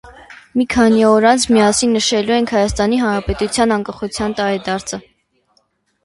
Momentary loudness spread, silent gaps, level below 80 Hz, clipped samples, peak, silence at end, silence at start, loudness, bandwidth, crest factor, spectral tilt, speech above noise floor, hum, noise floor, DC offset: 11 LU; none; -38 dBFS; under 0.1%; 0 dBFS; 1.05 s; 0.05 s; -15 LUFS; 11.5 kHz; 16 dB; -4 dB/octave; 47 dB; none; -62 dBFS; under 0.1%